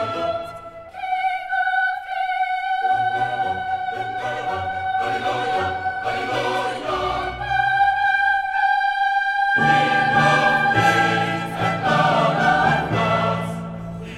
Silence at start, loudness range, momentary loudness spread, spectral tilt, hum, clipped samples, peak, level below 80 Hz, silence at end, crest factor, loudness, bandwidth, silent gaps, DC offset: 0 s; 6 LU; 9 LU; -5 dB/octave; none; under 0.1%; -4 dBFS; -48 dBFS; 0 s; 16 dB; -20 LUFS; 13.5 kHz; none; under 0.1%